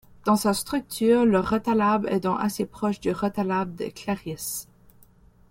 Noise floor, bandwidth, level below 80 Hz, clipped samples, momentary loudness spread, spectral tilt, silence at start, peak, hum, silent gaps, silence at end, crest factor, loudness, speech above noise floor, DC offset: -55 dBFS; 16.5 kHz; -54 dBFS; under 0.1%; 11 LU; -5.5 dB/octave; 0.25 s; -8 dBFS; none; none; 0.85 s; 16 dB; -25 LUFS; 31 dB; under 0.1%